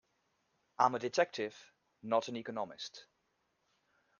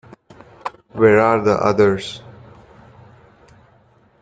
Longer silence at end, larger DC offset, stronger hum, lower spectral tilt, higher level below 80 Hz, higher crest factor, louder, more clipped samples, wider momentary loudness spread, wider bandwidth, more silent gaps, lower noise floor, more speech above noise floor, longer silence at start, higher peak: second, 1.15 s vs 2.05 s; neither; neither; second, -4 dB/octave vs -6.5 dB/octave; second, -86 dBFS vs -54 dBFS; first, 26 dB vs 18 dB; second, -36 LUFS vs -15 LUFS; neither; second, 15 LU vs 19 LU; second, 7.4 kHz vs 9 kHz; neither; first, -80 dBFS vs -54 dBFS; first, 45 dB vs 39 dB; first, 0.8 s vs 0.65 s; second, -14 dBFS vs -2 dBFS